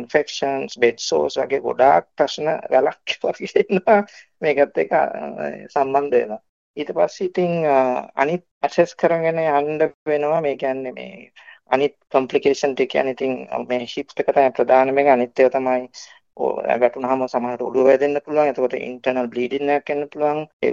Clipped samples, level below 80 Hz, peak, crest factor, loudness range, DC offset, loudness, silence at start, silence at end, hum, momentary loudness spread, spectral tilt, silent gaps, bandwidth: under 0.1%; -66 dBFS; -2 dBFS; 18 dB; 3 LU; under 0.1%; -20 LUFS; 0 s; 0 s; none; 9 LU; -5 dB/octave; 6.49-6.74 s, 8.51-8.61 s, 9.94-10.06 s, 20.53-20.60 s; 7.6 kHz